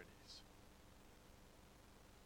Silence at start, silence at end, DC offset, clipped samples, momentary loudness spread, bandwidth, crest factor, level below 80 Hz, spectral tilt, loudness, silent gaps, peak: 0 s; 0 s; under 0.1%; under 0.1%; 6 LU; 19 kHz; 22 dB; -70 dBFS; -3.5 dB/octave; -63 LUFS; none; -42 dBFS